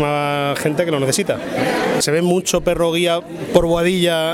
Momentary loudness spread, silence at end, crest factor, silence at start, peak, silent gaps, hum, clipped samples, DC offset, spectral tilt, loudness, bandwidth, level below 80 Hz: 3 LU; 0 s; 18 dB; 0 s; 0 dBFS; none; none; under 0.1%; under 0.1%; -4.5 dB/octave; -17 LUFS; 17 kHz; -40 dBFS